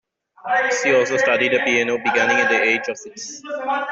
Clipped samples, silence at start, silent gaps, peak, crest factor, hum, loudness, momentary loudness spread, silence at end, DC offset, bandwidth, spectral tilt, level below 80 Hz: under 0.1%; 0.45 s; none; -6 dBFS; 14 dB; none; -18 LUFS; 14 LU; 0 s; under 0.1%; 8 kHz; -2.5 dB/octave; -66 dBFS